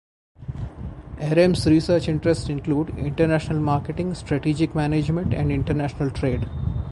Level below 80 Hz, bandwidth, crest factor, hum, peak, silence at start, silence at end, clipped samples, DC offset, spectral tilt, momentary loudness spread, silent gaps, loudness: -36 dBFS; 11.5 kHz; 18 dB; none; -4 dBFS; 0.4 s; 0 s; under 0.1%; under 0.1%; -7.5 dB/octave; 15 LU; none; -22 LUFS